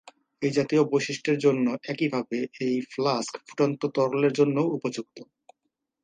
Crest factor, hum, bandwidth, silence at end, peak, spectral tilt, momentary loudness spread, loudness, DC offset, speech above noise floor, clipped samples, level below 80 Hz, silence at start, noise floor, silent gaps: 18 dB; none; 9.6 kHz; 0.8 s; -8 dBFS; -6 dB/octave; 8 LU; -26 LUFS; under 0.1%; 55 dB; under 0.1%; -74 dBFS; 0.4 s; -81 dBFS; none